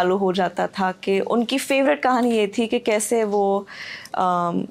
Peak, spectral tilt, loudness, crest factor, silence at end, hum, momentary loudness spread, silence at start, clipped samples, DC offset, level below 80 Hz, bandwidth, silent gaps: -8 dBFS; -4.5 dB/octave; -21 LUFS; 14 dB; 0.05 s; none; 5 LU; 0 s; under 0.1%; under 0.1%; -66 dBFS; 16 kHz; none